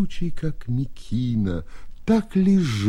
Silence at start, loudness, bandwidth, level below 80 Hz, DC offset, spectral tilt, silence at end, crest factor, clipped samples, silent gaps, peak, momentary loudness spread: 0 s; -24 LUFS; 11.5 kHz; -36 dBFS; under 0.1%; -7.5 dB/octave; 0 s; 16 dB; under 0.1%; none; -6 dBFS; 11 LU